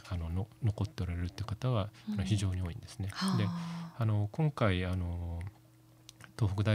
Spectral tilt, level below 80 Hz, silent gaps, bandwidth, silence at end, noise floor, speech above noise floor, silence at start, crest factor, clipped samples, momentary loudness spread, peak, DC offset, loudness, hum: -6.5 dB/octave; -56 dBFS; none; 14 kHz; 0 s; -60 dBFS; 27 dB; 0.05 s; 20 dB; under 0.1%; 10 LU; -14 dBFS; under 0.1%; -35 LUFS; none